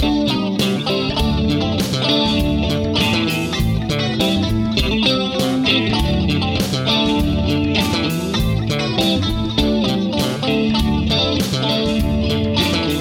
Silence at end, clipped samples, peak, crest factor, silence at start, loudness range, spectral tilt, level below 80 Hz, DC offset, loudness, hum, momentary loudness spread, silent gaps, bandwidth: 0 s; under 0.1%; -2 dBFS; 16 dB; 0 s; 1 LU; -5.5 dB/octave; -28 dBFS; under 0.1%; -17 LUFS; none; 3 LU; none; 17 kHz